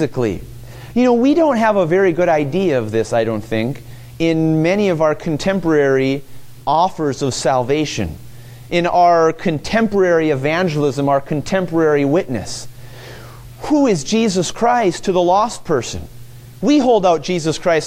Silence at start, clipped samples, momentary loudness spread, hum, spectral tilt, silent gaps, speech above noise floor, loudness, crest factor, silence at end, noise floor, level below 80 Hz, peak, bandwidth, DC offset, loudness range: 0 s; under 0.1%; 13 LU; none; -5.5 dB/octave; none; 20 dB; -16 LUFS; 14 dB; 0 s; -35 dBFS; -44 dBFS; -2 dBFS; 16 kHz; under 0.1%; 3 LU